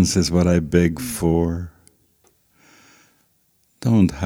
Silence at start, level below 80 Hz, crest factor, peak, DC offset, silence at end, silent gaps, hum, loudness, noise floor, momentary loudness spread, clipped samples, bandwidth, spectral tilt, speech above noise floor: 0 s; -40 dBFS; 18 dB; -2 dBFS; under 0.1%; 0 s; none; none; -19 LUFS; -63 dBFS; 10 LU; under 0.1%; 16.5 kHz; -6 dB/octave; 45 dB